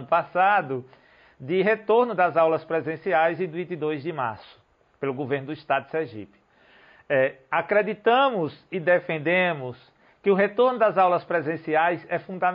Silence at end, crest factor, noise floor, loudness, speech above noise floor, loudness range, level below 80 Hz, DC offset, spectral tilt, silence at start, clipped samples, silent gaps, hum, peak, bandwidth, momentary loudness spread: 0 s; 16 dB; -56 dBFS; -24 LUFS; 32 dB; 6 LU; -70 dBFS; under 0.1%; -9 dB/octave; 0 s; under 0.1%; none; none; -10 dBFS; 5.4 kHz; 11 LU